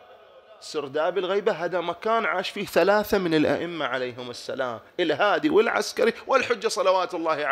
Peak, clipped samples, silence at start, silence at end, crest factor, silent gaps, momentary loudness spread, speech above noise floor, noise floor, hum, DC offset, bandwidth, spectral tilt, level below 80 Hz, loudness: -6 dBFS; under 0.1%; 0.1 s; 0 s; 18 dB; none; 10 LU; 26 dB; -50 dBFS; none; under 0.1%; 16 kHz; -4 dB/octave; -62 dBFS; -24 LUFS